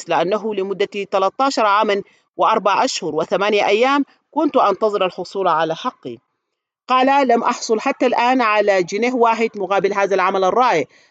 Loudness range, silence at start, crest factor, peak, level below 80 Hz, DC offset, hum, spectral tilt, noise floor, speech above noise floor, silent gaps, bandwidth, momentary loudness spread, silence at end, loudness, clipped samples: 2 LU; 0 s; 16 dB; -2 dBFS; -74 dBFS; under 0.1%; none; -4 dB/octave; -78 dBFS; 61 dB; none; 8.8 kHz; 7 LU; 0.25 s; -17 LUFS; under 0.1%